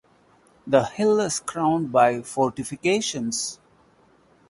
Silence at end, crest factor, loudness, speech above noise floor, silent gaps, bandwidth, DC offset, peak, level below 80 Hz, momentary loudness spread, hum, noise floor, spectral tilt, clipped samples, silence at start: 0.95 s; 20 dB; -23 LUFS; 36 dB; none; 11.5 kHz; under 0.1%; -4 dBFS; -62 dBFS; 7 LU; none; -58 dBFS; -4 dB/octave; under 0.1%; 0.65 s